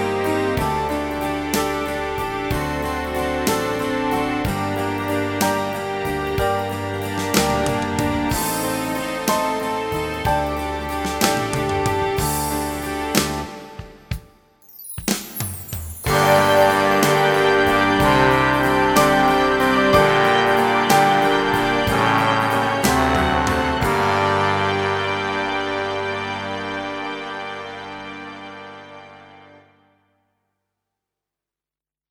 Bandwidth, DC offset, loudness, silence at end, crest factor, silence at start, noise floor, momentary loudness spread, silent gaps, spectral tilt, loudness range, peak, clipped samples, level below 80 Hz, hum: over 20 kHz; under 0.1%; -19 LUFS; 2.7 s; 20 dB; 0 s; under -90 dBFS; 14 LU; none; -4.5 dB/octave; 10 LU; 0 dBFS; under 0.1%; -38 dBFS; 50 Hz at -55 dBFS